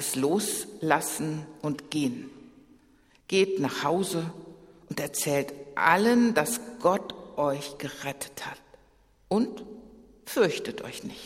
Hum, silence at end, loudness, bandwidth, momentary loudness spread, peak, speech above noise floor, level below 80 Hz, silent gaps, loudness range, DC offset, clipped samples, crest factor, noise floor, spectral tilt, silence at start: none; 0 s; -28 LUFS; 16 kHz; 16 LU; -6 dBFS; 34 dB; -64 dBFS; none; 6 LU; under 0.1%; under 0.1%; 24 dB; -61 dBFS; -4 dB/octave; 0 s